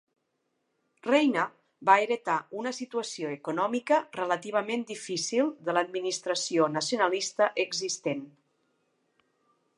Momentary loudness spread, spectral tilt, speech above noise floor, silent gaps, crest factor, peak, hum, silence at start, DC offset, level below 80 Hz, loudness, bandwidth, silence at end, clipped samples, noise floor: 10 LU; -3 dB/octave; 50 dB; none; 24 dB; -6 dBFS; none; 1.05 s; under 0.1%; -86 dBFS; -28 LUFS; 11.5 kHz; 1.5 s; under 0.1%; -78 dBFS